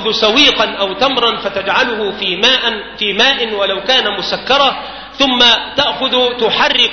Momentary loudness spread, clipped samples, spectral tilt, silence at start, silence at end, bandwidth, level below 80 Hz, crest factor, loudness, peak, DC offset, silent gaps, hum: 8 LU; under 0.1%; -2.5 dB/octave; 0 s; 0 s; 6.6 kHz; -44 dBFS; 14 dB; -12 LUFS; 0 dBFS; under 0.1%; none; none